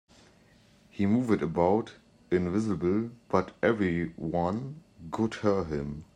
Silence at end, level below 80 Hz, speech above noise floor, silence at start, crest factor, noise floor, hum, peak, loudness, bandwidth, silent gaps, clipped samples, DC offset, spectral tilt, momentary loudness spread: 0.1 s; -56 dBFS; 32 dB; 0.95 s; 20 dB; -60 dBFS; none; -8 dBFS; -29 LUFS; 10 kHz; none; under 0.1%; under 0.1%; -8 dB/octave; 10 LU